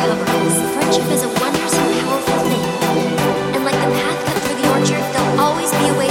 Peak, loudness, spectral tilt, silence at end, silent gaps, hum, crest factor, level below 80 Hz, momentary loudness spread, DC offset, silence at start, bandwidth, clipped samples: -2 dBFS; -16 LUFS; -4 dB/octave; 0 s; none; none; 14 dB; -46 dBFS; 2 LU; under 0.1%; 0 s; 17 kHz; under 0.1%